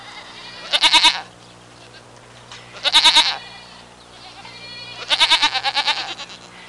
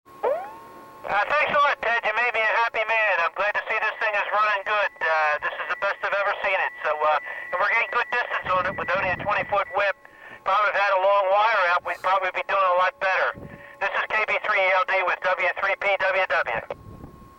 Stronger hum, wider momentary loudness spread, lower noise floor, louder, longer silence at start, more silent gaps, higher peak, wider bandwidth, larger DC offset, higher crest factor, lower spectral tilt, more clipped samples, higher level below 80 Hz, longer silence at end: first, 60 Hz at -50 dBFS vs none; first, 25 LU vs 7 LU; about the same, -44 dBFS vs -45 dBFS; first, -14 LUFS vs -22 LUFS; about the same, 0 s vs 0.1 s; neither; first, -4 dBFS vs -12 dBFS; second, 11.5 kHz vs 16.5 kHz; neither; first, 18 dB vs 12 dB; second, 0.5 dB/octave vs -3.5 dB/octave; neither; about the same, -54 dBFS vs -58 dBFS; second, 0 s vs 0.15 s